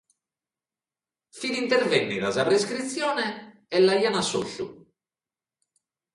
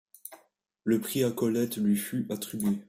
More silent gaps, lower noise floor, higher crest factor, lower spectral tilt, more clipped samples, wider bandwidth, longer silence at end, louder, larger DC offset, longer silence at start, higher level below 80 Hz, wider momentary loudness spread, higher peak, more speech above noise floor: neither; first, under -90 dBFS vs -65 dBFS; about the same, 20 dB vs 16 dB; second, -3.5 dB/octave vs -5.5 dB/octave; neither; second, 11.5 kHz vs 16 kHz; first, 1.4 s vs 0.05 s; first, -24 LUFS vs -29 LUFS; neither; first, 1.35 s vs 0.25 s; about the same, -68 dBFS vs -70 dBFS; second, 13 LU vs 17 LU; first, -6 dBFS vs -14 dBFS; first, over 66 dB vs 37 dB